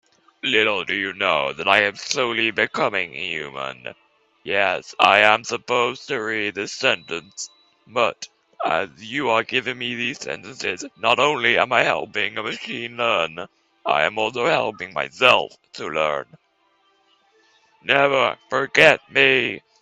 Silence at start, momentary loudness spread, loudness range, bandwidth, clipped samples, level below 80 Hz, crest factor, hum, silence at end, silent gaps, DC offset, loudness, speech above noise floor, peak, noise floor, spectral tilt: 0.45 s; 15 LU; 4 LU; 12 kHz; under 0.1%; -64 dBFS; 22 dB; none; 0.25 s; none; under 0.1%; -20 LUFS; 42 dB; 0 dBFS; -63 dBFS; -3 dB/octave